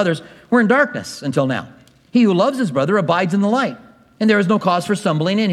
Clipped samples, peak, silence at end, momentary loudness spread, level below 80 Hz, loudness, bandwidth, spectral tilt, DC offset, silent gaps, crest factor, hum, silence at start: under 0.1%; 0 dBFS; 0 s; 7 LU; -64 dBFS; -17 LUFS; 12.5 kHz; -6 dB/octave; under 0.1%; none; 16 dB; none; 0 s